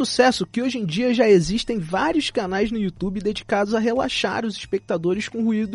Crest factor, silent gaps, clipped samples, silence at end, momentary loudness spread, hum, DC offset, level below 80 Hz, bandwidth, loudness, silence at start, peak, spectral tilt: 18 dB; none; under 0.1%; 0 s; 8 LU; none; under 0.1%; -46 dBFS; 11.5 kHz; -22 LUFS; 0 s; -4 dBFS; -5 dB/octave